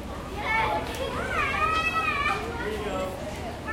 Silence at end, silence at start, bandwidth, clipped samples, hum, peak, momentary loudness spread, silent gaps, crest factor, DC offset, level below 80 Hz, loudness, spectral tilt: 0 s; 0 s; 16.5 kHz; under 0.1%; none; -14 dBFS; 10 LU; none; 14 dB; under 0.1%; -42 dBFS; -27 LUFS; -4.5 dB/octave